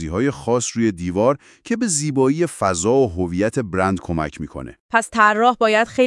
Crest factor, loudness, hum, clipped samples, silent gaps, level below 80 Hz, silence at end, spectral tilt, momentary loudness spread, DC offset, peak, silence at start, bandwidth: 18 dB; -19 LUFS; none; under 0.1%; 4.80-4.89 s; -48 dBFS; 0 s; -4.5 dB/octave; 10 LU; under 0.1%; 0 dBFS; 0 s; 12 kHz